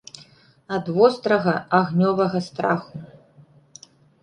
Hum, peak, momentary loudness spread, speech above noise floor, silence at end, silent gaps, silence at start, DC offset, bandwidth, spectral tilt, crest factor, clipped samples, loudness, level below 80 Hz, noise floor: none; -2 dBFS; 15 LU; 32 dB; 1.15 s; none; 0.7 s; under 0.1%; 10 kHz; -7 dB/octave; 20 dB; under 0.1%; -21 LUFS; -64 dBFS; -53 dBFS